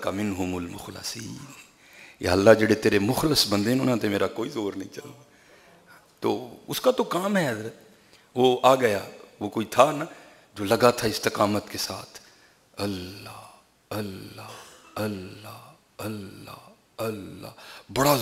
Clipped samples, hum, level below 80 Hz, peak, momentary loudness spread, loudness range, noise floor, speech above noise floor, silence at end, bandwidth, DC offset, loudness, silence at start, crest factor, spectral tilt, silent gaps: under 0.1%; none; -58 dBFS; -2 dBFS; 22 LU; 14 LU; -57 dBFS; 32 dB; 0 s; 16 kHz; under 0.1%; -25 LUFS; 0 s; 24 dB; -4.5 dB/octave; none